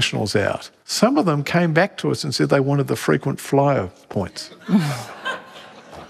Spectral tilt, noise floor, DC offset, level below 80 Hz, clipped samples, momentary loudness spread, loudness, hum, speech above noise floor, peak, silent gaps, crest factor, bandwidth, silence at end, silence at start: -5.5 dB/octave; -42 dBFS; under 0.1%; -60 dBFS; under 0.1%; 13 LU; -20 LUFS; none; 22 dB; -2 dBFS; none; 18 dB; 14.5 kHz; 0 s; 0 s